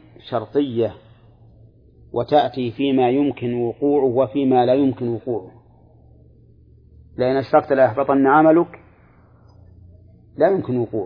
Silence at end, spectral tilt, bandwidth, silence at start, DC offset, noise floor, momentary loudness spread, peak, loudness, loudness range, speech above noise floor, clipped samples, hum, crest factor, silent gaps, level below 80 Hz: 0 s; -10 dB/octave; 5.2 kHz; 0.25 s; under 0.1%; -51 dBFS; 12 LU; -2 dBFS; -19 LUFS; 4 LU; 33 dB; under 0.1%; none; 18 dB; none; -54 dBFS